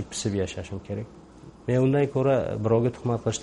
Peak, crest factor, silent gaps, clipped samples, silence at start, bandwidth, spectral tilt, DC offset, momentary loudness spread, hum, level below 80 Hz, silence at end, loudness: -10 dBFS; 16 dB; none; under 0.1%; 0 s; 11.5 kHz; -6.5 dB/octave; under 0.1%; 13 LU; none; -52 dBFS; 0 s; -26 LUFS